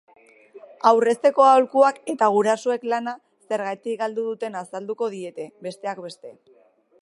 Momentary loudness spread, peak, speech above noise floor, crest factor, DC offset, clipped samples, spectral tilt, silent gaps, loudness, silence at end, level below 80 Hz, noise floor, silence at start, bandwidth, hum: 18 LU; -2 dBFS; 26 dB; 20 dB; under 0.1%; under 0.1%; -4.5 dB/octave; none; -21 LUFS; 0.7 s; -82 dBFS; -48 dBFS; 0.55 s; 11.5 kHz; none